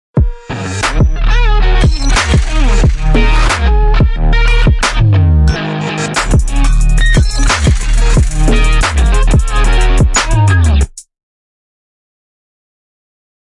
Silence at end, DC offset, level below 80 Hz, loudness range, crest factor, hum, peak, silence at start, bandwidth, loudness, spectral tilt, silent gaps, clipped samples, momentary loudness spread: 2.5 s; under 0.1%; -12 dBFS; 2 LU; 10 dB; none; 0 dBFS; 0.15 s; 11.5 kHz; -12 LUFS; -5 dB/octave; none; under 0.1%; 5 LU